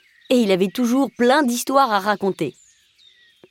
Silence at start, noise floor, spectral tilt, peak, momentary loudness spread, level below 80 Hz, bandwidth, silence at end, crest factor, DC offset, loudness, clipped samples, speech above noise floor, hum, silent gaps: 0.3 s; -54 dBFS; -4.5 dB/octave; -4 dBFS; 6 LU; -70 dBFS; 17 kHz; 1 s; 16 dB; under 0.1%; -19 LUFS; under 0.1%; 36 dB; none; none